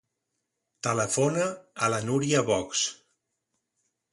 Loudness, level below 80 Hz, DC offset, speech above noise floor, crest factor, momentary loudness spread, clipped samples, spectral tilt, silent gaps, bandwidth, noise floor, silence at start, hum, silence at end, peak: -27 LUFS; -64 dBFS; under 0.1%; 55 dB; 20 dB; 6 LU; under 0.1%; -4 dB/octave; none; 11.5 kHz; -82 dBFS; 0.85 s; none; 1.2 s; -10 dBFS